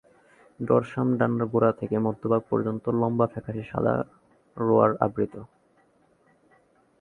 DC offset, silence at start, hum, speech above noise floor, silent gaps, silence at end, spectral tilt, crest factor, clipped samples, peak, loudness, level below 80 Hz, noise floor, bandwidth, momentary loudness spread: under 0.1%; 0.6 s; none; 39 dB; none; 1.55 s; -10.5 dB/octave; 22 dB; under 0.1%; -4 dBFS; -25 LUFS; -60 dBFS; -63 dBFS; 4.1 kHz; 11 LU